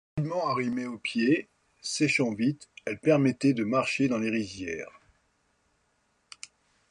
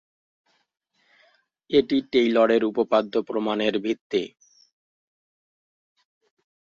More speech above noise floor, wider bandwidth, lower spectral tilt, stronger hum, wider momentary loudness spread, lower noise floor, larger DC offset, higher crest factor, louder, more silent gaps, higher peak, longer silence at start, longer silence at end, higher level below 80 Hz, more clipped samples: first, 45 dB vs 41 dB; first, 11.5 kHz vs 7.4 kHz; about the same, -5.5 dB/octave vs -6 dB/octave; neither; first, 15 LU vs 8 LU; first, -72 dBFS vs -63 dBFS; neither; about the same, 18 dB vs 20 dB; second, -28 LUFS vs -23 LUFS; second, none vs 4.01-4.10 s; second, -10 dBFS vs -6 dBFS; second, 0.15 s vs 1.7 s; second, 2 s vs 2.5 s; about the same, -64 dBFS vs -66 dBFS; neither